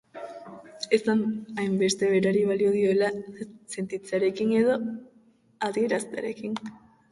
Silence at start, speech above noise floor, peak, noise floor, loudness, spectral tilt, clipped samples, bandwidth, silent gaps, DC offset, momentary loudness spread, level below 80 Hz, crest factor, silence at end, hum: 0.15 s; 35 dB; -8 dBFS; -60 dBFS; -26 LUFS; -5 dB/octave; under 0.1%; 11.5 kHz; none; under 0.1%; 18 LU; -68 dBFS; 18 dB; 0.35 s; none